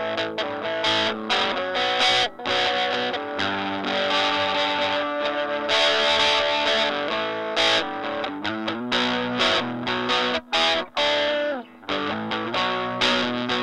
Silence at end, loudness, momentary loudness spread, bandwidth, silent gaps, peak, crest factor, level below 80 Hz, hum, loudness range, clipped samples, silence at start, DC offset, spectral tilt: 0 s; -22 LUFS; 8 LU; 11.5 kHz; none; -6 dBFS; 18 dB; -58 dBFS; none; 2 LU; under 0.1%; 0 s; under 0.1%; -3 dB/octave